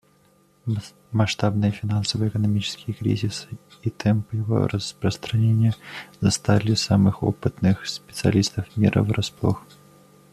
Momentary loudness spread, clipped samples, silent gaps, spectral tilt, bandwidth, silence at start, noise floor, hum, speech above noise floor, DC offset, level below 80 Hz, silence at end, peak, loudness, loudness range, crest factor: 10 LU; under 0.1%; none; -6 dB/octave; 13 kHz; 0.65 s; -59 dBFS; none; 37 dB; under 0.1%; -52 dBFS; 0.75 s; -4 dBFS; -23 LUFS; 3 LU; 20 dB